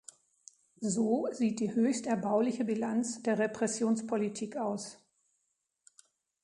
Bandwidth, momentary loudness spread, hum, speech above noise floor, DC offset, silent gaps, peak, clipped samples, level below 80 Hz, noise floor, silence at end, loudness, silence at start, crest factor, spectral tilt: 11 kHz; 6 LU; none; 50 dB; under 0.1%; none; -16 dBFS; under 0.1%; -78 dBFS; -81 dBFS; 1.5 s; -32 LUFS; 0.8 s; 16 dB; -5 dB/octave